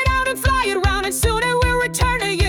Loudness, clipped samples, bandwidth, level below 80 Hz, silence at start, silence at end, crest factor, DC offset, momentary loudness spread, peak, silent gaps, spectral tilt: -18 LUFS; under 0.1%; 18 kHz; -26 dBFS; 0 s; 0 s; 12 dB; under 0.1%; 1 LU; -6 dBFS; none; -4 dB/octave